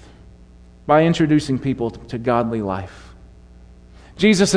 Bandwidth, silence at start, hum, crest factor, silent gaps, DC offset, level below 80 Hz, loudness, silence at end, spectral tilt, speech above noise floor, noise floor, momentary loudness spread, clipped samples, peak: 11 kHz; 0.85 s; 60 Hz at -45 dBFS; 18 dB; none; under 0.1%; -44 dBFS; -19 LUFS; 0 s; -5.5 dB/octave; 28 dB; -45 dBFS; 12 LU; under 0.1%; -2 dBFS